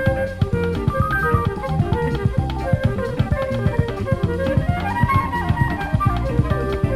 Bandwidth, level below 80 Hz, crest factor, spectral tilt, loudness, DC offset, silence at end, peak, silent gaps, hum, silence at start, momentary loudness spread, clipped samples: 13 kHz; -28 dBFS; 16 dB; -8 dB/octave; -21 LUFS; under 0.1%; 0 s; -4 dBFS; none; none; 0 s; 4 LU; under 0.1%